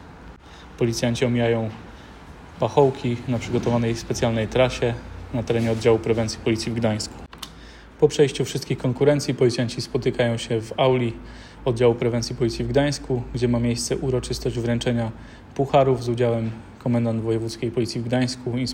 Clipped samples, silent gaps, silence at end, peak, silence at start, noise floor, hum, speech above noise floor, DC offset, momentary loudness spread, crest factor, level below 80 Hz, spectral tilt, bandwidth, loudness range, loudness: under 0.1%; none; 0 s; -4 dBFS; 0 s; -43 dBFS; none; 21 dB; under 0.1%; 12 LU; 18 dB; -44 dBFS; -6 dB/octave; 16 kHz; 2 LU; -23 LUFS